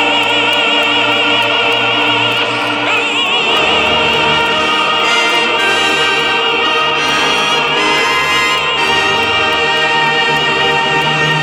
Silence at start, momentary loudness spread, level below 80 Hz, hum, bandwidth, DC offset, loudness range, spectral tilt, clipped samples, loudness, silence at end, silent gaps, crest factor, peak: 0 s; 1 LU; -44 dBFS; none; over 20 kHz; under 0.1%; 1 LU; -2.5 dB/octave; under 0.1%; -10 LUFS; 0 s; none; 12 dB; -2 dBFS